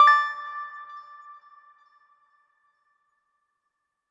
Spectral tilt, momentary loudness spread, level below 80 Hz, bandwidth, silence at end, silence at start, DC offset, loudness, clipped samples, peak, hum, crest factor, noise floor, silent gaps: 2 dB/octave; 27 LU; -90 dBFS; 10 kHz; 3.1 s; 0 s; under 0.1%; -24 LUFS; under 0.1%; -6 dBFS; none; 22 dB; -80 dBFS; none